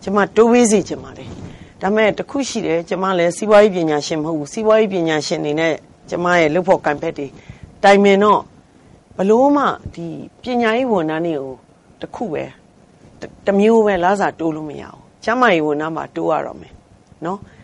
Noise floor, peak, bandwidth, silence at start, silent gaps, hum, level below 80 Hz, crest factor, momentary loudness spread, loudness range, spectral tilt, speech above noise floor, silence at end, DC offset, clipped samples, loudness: -48 dBFS; -2 dBFS; 11.5 kHz; 0 s; none; none; -50 dBFS; 16 dB; 18 LU; 5 LU; -5 dB/octave; 31 dB; 0.25 s; under 0.1%; under 0.1%; -16 LUFS